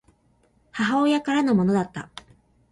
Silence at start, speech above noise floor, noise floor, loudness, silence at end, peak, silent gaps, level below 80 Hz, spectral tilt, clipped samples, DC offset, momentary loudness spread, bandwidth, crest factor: 0.75 s; 41 dB; -63 dBFS; -22 LUFS; 0.65 s; -10 dBFS; none; -58 dBFS; -6.5 dB/octave; under 0.1%; under 0.1%; 19 LU; 11.5 kHz; 14 dB